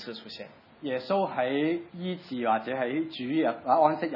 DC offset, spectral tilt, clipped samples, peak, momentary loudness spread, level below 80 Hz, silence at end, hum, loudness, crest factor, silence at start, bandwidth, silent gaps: under 0.1%; -8 dB/octave; under 0.1%; -8 dBFS; 16 LU; -80 dBFS; 0 s; none; -28 LUFS; 20 dB; 0 s; 5.8 kHz; none